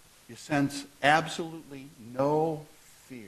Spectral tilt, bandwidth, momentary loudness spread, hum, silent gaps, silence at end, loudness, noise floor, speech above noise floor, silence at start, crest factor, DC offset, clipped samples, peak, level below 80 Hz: -5 dB/octave; 13 kHz; 22 LU; none; none; 0 s; -28 LUFS; -48 dBFS; 19 dB; 0.3 s; 24 dB; under 0.1%; under 0.1%; -6 dBFS; -66 dBFS